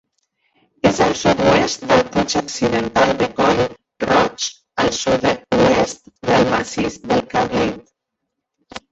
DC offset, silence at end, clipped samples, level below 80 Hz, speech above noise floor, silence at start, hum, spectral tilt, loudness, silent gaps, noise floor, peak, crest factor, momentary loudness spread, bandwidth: under 0.1%; 0.15 s; under 0.1%; -44 dBFS; 61 dB; 0.85 s; none; -4.5 dB/octave; -17 LUFS; none; -78 dBFS; -2 dBFS; 16 dB; 9 LU; 8.2 kHz